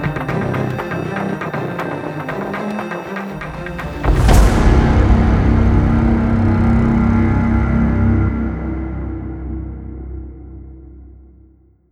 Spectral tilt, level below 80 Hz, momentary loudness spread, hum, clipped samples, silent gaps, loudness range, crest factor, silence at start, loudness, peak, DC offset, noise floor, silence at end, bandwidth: -7.5 dB/octave; -20 dBFS; 14 LU; none; under 0.1%; none; 10 LU; 16 dB; 0 s; -17 LUFS; 0 dBFS; under 0.1%; -49 dBFS; 0.75 s; 14 kHz